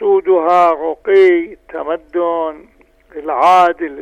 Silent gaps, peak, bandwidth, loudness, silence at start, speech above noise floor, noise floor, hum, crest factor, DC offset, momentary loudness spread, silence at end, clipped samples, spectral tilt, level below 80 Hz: none; -2 dBFS; 8.8 kHz; -13 LUFS; 0 s; 36 dB; -48 dBFS; none; 12 dB; under 0.1%; 15 LU; 0 s; under 0.1%; -5 dB/octave; -52 dBFS